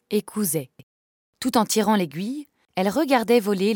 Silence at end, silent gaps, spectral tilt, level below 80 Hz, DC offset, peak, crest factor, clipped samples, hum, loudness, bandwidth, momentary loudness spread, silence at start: 0 s; 0.83-1.33 s; -4.5 dB/octave; -66 dBFS; under 0.1%; -4 dBFS; 18 dB; under 0.1%; none; -23 LUFS; 18 kHz; 12 LU; 0.1 s